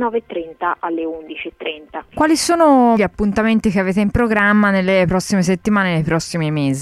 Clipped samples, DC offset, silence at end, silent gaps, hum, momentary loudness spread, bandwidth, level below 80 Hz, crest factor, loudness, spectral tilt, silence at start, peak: under 0.1%; under 0.1%; 0 s; none; none; 14 LU; 13 kHz; -40 dBFS; 12 dB; -16 LUFS; -5.5 dB/octave; 0 s; -4 dBFS